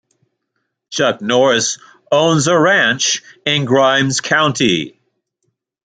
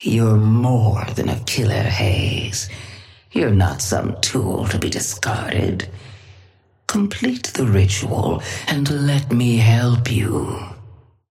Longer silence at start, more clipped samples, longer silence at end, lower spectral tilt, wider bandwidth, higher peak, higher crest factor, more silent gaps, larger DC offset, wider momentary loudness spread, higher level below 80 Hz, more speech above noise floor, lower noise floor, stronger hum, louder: first, 0.9 s vs 0 s; neither; first, 0.95 s vs 0.35 s; second, -3.5 dB/octave vs -5.5 dB/octave; second, 9.6 kHz vs 15 kHz; about the same, -2 dBFS vs -4 dBFS; about the same, 14 dB vs 16 dB; neither; neither; second, 8 LU vs 11 LU; second, -58 dBFS vs -42 dBFS; first, 58 dB vs 34 dB; first, -72 dBFS vs -52 dBFS; neither; first, -14 LUFS vs -19 LUFS